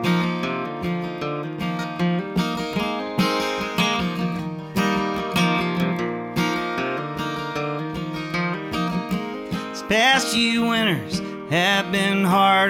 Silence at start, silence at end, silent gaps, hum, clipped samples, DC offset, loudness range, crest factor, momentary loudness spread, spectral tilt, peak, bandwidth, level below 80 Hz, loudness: 0 s; 0 s; none; none; under 0.1%; under 0.1%; 5 LU; 18 dB; 9 LU; -4.5 dB/octave; -4 dBFS; 16.5 kHz; -52 dBFS; -22 LUFS